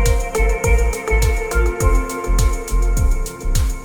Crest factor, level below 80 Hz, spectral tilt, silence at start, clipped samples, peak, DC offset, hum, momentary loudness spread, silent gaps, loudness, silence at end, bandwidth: 12 dB; -16 dBFS; -5 dB/octave; 0 s; under 0.1%; -4 dBFS; under 0.1%; none; 4 LU; none; -19 LUFS; 0 s; over 20 kHz